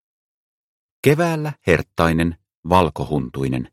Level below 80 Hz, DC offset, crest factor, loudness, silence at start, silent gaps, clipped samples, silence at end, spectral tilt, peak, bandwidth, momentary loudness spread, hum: -40 dBFS; under 0.1%; 20 dB; -20 LUFS; 1.05 s; 2.57-2.63 s; under 0.1%; 0.05 s; -6.5 dB/octave; 0 dBFS; 15.5 kHz; 7 LU; none